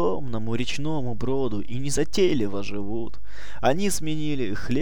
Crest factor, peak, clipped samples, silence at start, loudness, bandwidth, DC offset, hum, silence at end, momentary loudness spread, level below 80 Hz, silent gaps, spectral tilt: 18 dB; -8 dBFS; under 0.1%; 0 s; -27 LUFS; 19 kHz; 9%; none; 0 s; 10 LU; -44 dBFS; none; -5 dB/octave